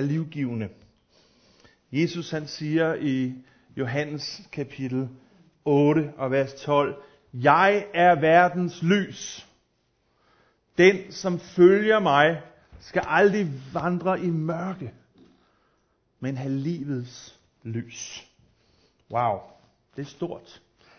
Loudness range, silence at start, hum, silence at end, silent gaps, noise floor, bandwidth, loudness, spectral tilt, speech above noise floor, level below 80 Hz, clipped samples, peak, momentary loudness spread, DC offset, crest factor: 12 LU; 0 s; none; 0.6 s; none; -70 dBFS; 6.6 kHz; -24 LUFS; -6 dB/octave; 46 dB; -64 dBFS; under 0.1%; -4 dBFS; 19 LU; under 0.1%; 22 dB